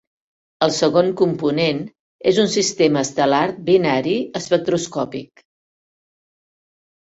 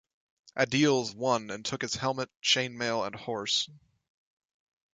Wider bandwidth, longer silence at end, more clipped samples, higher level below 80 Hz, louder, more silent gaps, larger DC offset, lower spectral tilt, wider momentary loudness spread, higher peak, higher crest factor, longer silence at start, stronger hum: second, 8 kHz vs 9.6 kHz; first, 1.85 s vs 1.2 s; neither; first, -60 dBFS vs -68 dBFS; first, -18 LUFS vs -29 LUFS; first, 2.00-2.19 s vs 2.36-2.40 s; neither; about the same, -4.5 dB/octave vs -3.5 dB/octave; about the same, 9 LU vs 9 LU; first, 0 dBFS vs -10 dBFS; about the same, 20 dB vs 20 dB; first, 0.6 s vs 0.45 s; neither